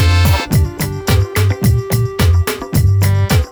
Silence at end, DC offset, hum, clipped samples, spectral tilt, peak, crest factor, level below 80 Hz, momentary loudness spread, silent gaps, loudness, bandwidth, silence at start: 0 s; under 0.1%; none; under 0.1%; -5.5 dB/octave; -4 dBFS; 10 dB; -22 dBFS; 4 LU; none; -14 LUFS; over 20 kHz; 0 s